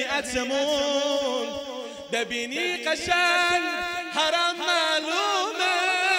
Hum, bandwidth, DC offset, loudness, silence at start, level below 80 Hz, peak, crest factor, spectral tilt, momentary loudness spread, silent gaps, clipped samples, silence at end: none; 16 kHz; under 0.1%; -24 LUFS; 0 s; -58 dBFS; -8 dBFS; 16 dB; -1 dB/octave; 8 LU; none; under 0.1%; 0 s